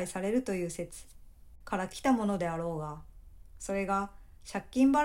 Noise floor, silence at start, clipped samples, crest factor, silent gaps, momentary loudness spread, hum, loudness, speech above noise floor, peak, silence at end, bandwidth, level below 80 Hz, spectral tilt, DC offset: -52 dBFS; 0 s; under 0.1%; 16 dB; none; 15 LU; none; -33 LUFS; 21 dB; -16 dBFS; 0 s; 16 kHz; -54 dBFS; -5.5 dB/octave; under 0.1%